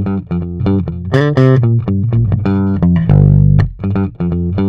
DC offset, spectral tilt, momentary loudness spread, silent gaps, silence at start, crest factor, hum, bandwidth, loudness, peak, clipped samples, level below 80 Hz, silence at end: under 0.1%; -10 dB/octave; 8 LU; none; 0 s; 12 dB; none; 6 kHz; -13 LUFS; 0 dBFS; 0.4%; -26 dBFS; 0 s